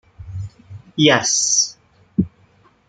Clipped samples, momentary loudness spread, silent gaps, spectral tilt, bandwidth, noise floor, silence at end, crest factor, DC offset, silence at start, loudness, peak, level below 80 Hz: under 0.1%; 19 LU; none; -2.5 dB/octave; 11 kHz; -54 dBFS; 0.6 s; 20 dB; under 0.1%; 0.2 s; -17 LUFS; -2 dBFS; -50 dBFS